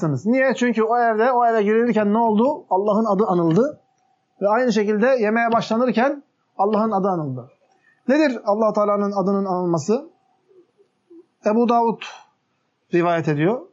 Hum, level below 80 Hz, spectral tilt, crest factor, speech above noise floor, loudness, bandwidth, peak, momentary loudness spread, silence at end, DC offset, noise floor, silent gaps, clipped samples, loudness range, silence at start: none; -76 dBFS; -7 dB/octave; 14 dB; 51 dB; -19 LUFS; 7.8 kHz; -4 dBFS; 6 LU; 0.1 s; under 0.1%; -69 dBFS; none; under 0.1%; 5 LU; 0 s